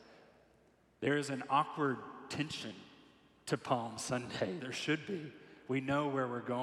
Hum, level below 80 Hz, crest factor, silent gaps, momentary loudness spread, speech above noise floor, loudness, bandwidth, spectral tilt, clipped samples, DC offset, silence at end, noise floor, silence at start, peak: none; -76 dBFS; 20 dB; none; 10 LU; 32 dB; -37 LUFS; 14 kHz; -5 dB/octave; under 0.1%; under 0.1%; 0 s; -69 dBFS; 0 s; -18 dBFS